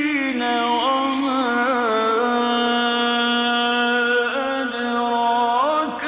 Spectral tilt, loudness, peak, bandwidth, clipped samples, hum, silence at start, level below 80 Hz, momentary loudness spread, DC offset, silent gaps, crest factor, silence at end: -6.5 dB/octave; -19 LUFS; -8 dBFS; 4 kHz; under 0.1%; none; 0 s; -62 dBFS; 3 LU; under 0.1%; none; 12 dB; 0 s